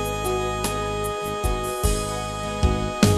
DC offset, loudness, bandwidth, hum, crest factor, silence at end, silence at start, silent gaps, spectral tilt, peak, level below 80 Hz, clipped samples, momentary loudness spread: under 0.1%; -25 LUFS; 13 kHz; none; 22 dB; 0 s; 0 s; none; -5 dB/octave; -2 dBFS; -30 dBFS; under 0.1%; 4 LU